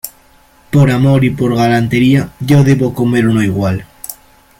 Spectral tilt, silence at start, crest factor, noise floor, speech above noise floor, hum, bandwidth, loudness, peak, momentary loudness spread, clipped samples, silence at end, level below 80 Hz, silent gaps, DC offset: -7 dB/octave; 0.05 s; 12 dB; -46 dBFS; 36 dB; none; 17 kHz; -12 LUFS; 0 dBFS; 14 LU; under 0.1%; 0.45 s; -40 dBFS; none; under 0.1%